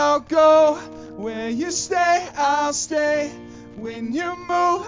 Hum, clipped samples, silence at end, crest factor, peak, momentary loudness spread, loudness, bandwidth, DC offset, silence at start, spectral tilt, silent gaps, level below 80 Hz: none; under 0.1%; 0 s; 16 dB; -4 dBFS; 18 LU; -20 LUFS; 7.6 kHz; under 0.1%; 0 s; -3 dB/octave; none; -56 dBFS